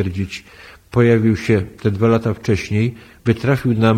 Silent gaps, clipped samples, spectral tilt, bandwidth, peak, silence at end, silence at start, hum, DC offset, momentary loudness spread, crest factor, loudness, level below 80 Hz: none; under 0.1%; -7.5 dB/octave; 13 kHz; -2 dBFS; 0 s; 0 s; none; under 0.1%; 10 LU; 16 dB; -18 LUFS; -44 dBFS